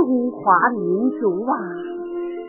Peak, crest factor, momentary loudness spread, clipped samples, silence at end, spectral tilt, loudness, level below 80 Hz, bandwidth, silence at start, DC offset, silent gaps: -2 dBFS; 18 dB; 12 LU; under 0.1%; 0 s; -12 dB/octave; -20 LUFS; -68 dBFS; 3.1 kHz; 0 s; under 0.1%; none